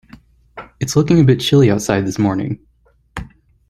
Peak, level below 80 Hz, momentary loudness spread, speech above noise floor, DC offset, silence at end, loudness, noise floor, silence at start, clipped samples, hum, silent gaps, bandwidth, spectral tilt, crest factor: -2 dBFS; -42 dBFS; 21 LU; 31 dB; under 0.1%; 0.45 s; -15 LUFS; -45 dBFS; 0.55 s; under 0.1%; none; none; 14 kHz; -6 dB/octave; 16 dB